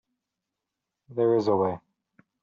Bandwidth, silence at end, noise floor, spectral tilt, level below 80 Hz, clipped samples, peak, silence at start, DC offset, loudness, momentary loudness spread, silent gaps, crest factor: 7 kHz; 0.65 s; -86 dBFS; -7.5 dB/octave; -72 dBFS; under 0.1%; -12 dBFS; 1.1 s; under 0.1%; -25 LUFS; 14 LU; none; 16 dB